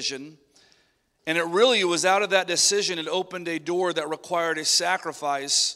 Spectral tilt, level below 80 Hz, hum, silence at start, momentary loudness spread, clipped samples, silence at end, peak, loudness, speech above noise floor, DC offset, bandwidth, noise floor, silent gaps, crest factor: -1.5 dB/octave; -76 dBFS; none; 0 s; 10 LU; under 0.1%; 0 s; -4 dBFS; -23 LUFS; 42 dB; under 0.1%; 16 kHz; -66 dBFS; none; 20 dB